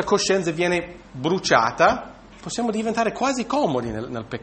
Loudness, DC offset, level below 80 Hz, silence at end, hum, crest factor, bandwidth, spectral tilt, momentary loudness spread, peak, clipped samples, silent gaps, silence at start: -22 LUFS; under 0.1%; -50 dBFS; 0 s; none; 20 dB; 8.8 kHz; -4 dB/octave; 12 LU; -2 dBFS; under 0.1%; none; 0 s